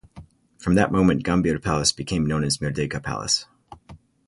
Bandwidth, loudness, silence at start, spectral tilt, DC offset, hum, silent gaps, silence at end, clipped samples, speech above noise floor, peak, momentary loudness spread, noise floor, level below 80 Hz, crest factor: 11.5 kHz; -22 LUFS; 0.15 s; -4.5 dB/octave; under 0.1%; none; none; 0.3 s; under 0.1%; 26 dB; -6 dBFS; 8 LU; -48 dBFS; -42 dBFS; 18 dB